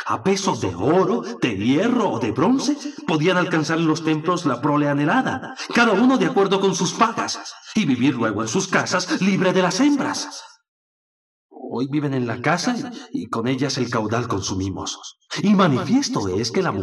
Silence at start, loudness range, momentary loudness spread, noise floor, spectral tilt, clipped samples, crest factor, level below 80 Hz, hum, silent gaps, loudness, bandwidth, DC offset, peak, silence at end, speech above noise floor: 0 s; 5 LU; 10 LU; under -90 dBFS; -5 dB/octave; under 0.1%; 18 dB; -66 dBFS; none; 10.68-11.49 s; -20 LUFS; 12 kHz; under 0.1%; -4 dBFS; 0 s; over 70 dB